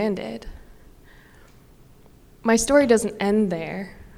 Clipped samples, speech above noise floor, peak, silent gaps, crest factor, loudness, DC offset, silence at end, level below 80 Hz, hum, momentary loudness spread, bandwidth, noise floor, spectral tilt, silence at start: under 0.1%; 29 dB; -4 dBFS; none; 20 dB; -21 LUFS; under 0.1%; 0.15 s; -46 dBFS; none; 17 LU; 15.5 kHz; -50 dBFS; -4.5 dB/octave; 0 s